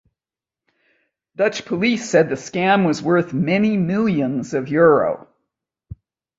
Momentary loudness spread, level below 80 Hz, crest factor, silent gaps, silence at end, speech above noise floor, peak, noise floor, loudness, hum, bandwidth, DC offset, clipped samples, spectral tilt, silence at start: 7 LU; -54 dBFS; 18 dB; none; 0.45 s; 72 dB; -2 dBFS; -90 dBFS; -18 LUFS; none; 8 kHz; under 0.1%; under 0.1%; -6 dB/octave; 1.4 s